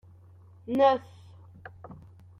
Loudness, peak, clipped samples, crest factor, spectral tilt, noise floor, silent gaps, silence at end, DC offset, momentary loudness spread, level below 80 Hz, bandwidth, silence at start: -25 LUFS; -10 dBFS; under 0.1%; 20 dB; -7 dB/octave; -53 dBFS; none; 0.45 s; under 0.1%; 26 LU; -66 dBFS; 6.4 kHz; 0.7 s